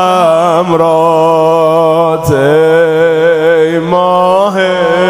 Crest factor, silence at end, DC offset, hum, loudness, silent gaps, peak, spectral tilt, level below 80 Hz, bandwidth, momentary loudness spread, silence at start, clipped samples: 8 dB; 0 s; under 0.1%; none; -8 LUFS; none; 0 dBFS; -6 dB/octave; -42 dBFS; 16 kHz; 2 LU; 0 s; under 0.1%